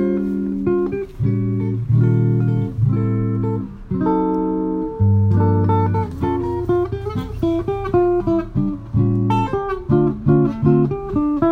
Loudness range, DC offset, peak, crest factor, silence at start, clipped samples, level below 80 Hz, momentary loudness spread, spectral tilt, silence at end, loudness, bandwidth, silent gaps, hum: 2 LU; under 0.1%; -2 dBFS; 14 dB; 0 s; under 0.1%; -36 dBFS; 6 LU; -10.5 dB/octave; 0 s; -19 LUFS; 4.8 kHz; none; none